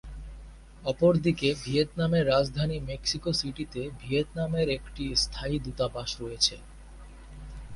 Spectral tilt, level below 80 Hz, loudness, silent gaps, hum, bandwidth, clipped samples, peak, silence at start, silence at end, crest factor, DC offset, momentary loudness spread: -5 dB/octave; -44 dBFS; -28 LUFS; none; none; 11.5 kHz; under 0.1%; -10 dBFS; 0.05 s; 0 s; 18 dB; under 0.1%; 21 LU